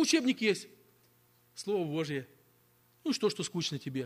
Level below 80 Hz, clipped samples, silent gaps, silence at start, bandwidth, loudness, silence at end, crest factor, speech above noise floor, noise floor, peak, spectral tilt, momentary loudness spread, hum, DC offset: -78 dBFS; under 0.1%; none; 0 s; 15.5 kHz; -33 LUFS; 0 s; 18 dB; 35 dB; -67 dBFS; -16 dBFS; -4 dB/octave; 17 LU; 60 Hz at -65 dBFS; under 0.1%